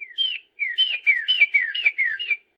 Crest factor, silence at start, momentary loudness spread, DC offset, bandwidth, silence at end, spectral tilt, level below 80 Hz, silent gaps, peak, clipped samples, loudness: 16 dB; 0 s; 8 LU; under 0.1%; 7.6 kHz; 0.2 s; 3 dB/octave; -88 dBFS; none; -6 dBFS; under 0.1%; -20 LUFS